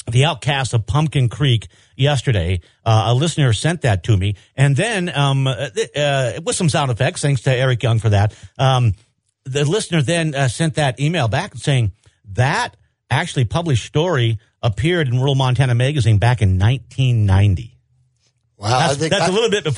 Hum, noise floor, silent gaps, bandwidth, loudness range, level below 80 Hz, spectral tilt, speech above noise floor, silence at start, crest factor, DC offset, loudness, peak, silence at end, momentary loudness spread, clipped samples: none; -63 dBFS; none; 11 kHz; 3 LU; -42 dBFS; -5.5 dB/octave; 47 dB; 0.05 s; 16 dB; under 0.1%; -18 LUFS; -2 dBFS; 0 s; 6 LU; under 0.1%